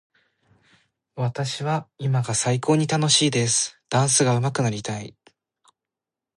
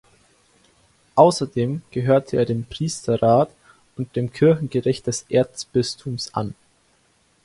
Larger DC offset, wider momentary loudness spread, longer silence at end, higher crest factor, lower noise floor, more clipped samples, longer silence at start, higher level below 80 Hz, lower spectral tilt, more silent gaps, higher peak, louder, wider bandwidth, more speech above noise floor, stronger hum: neither; about the same, 12 LU vs 12 LU; first, 1.25 s vs 0.9 s; about the same, 18 dB vs 22 dB; first, -88 dBFS vs -62 dBFS; neither; about the same, 1.15 s vs 1.15 s; second, -62 dBFS vs -54 dBFS; second, -4 dB/octave vs -6 dB/octave; neither; second, -6 dBFS vs 0 dBFS; about the same, -22 LUFS vs -21 LUFS; about the same, 11.5 kHz vs 11.5 kHz; first, 66 dB vs 41 dB; neither